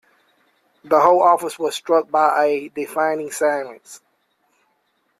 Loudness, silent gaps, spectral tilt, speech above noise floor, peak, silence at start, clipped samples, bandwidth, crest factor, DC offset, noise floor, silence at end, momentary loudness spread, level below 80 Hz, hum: -18 LUFS; none; -3.5 dB/octave; 49 dB; 0 dBFS; 0.85 s; under 0.1%; 15 kHz; 20 dB; under 0.1%; -67 dBFS; 1.25 s; 12 LU; -68 dBFS; none